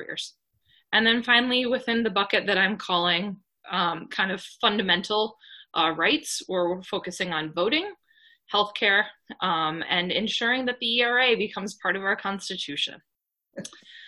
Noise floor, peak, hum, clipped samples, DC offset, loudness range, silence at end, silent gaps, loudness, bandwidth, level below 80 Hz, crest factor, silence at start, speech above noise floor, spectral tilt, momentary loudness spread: -65 dBFS; -6 dBFS; none; under 0.1%; under 0.1%; 3 LU; 0 s; none; -24 LUFS; 12.5 kHz; -66 dBFS; 20 dB; 0 s; 40 dB; -3 dB/octave; 11 LU